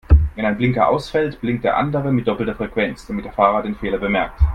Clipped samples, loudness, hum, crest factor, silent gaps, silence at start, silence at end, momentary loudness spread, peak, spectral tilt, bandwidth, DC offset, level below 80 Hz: under 0.1%; -19 LUFS; none; 18 dB; none; 0.1 s; 0 s; 6 LU; 0 dBFS; -8 dB/octave; 8.8 kHz; under 0.1%; -24 dBFS